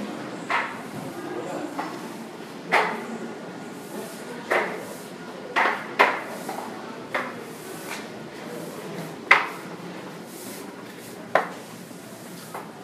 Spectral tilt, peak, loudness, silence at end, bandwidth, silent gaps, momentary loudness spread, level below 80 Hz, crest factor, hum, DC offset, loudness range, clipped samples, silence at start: -3.5 dB/octave; 0 dBFS; -28 LUFS; 0 s; 15.5 kHz; none; 17 LU; -76 dBFS; 30 dB; none; under 0.1%; 3 LU; under 0.1%; 0 s